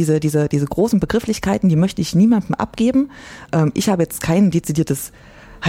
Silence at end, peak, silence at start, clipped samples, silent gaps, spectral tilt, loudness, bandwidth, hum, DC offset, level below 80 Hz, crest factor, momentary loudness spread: 0 s; -4 dBFS; 0 s; under 0.1%; none; -6.5 dB/octave; -18 LUFS; 16.5 kHz; none; under 0.1%; -42 dBFS; 14 dB; 7 LU